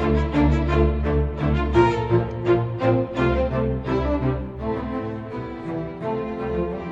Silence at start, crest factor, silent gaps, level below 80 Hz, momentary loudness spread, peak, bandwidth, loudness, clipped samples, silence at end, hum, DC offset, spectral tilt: 0 s; 18 dB; none; -28 dBFS; 10 LU; -4 dBFS; 7.6 kHz; -23 LUFS; under 0.1%; 0 s; none; under 0.1%; -9 dB/octave